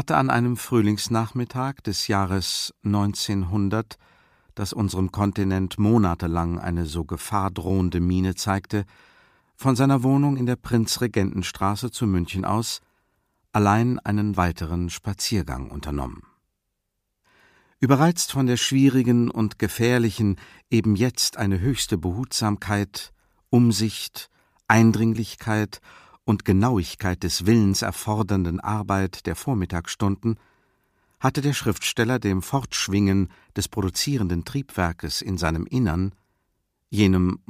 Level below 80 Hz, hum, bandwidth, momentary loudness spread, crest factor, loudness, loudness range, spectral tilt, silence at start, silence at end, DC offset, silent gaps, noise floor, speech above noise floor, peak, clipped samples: -44 dBFS; none; 15.5 kHz; 10 LU; 22 dB; -23 LUFS; 4 LU; -5.5 dB/octave; 0 s; 0.15 s; under 0.1%; none; -78 dBFS; 56 dB; 0 dBFS; under 0.1%